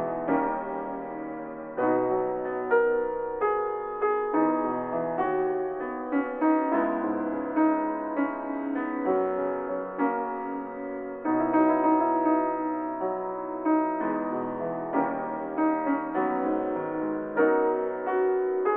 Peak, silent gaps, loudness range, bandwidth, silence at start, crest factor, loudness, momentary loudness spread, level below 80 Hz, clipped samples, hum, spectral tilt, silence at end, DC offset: -10 dBFS; none; 2 LU; 3.5 kHz; 0 s; 18 dB; -27 LUFS; 9 LU; -62 dBFS; under 0.1%; none; -6.5 dB/octave; 0 s; under 0.1%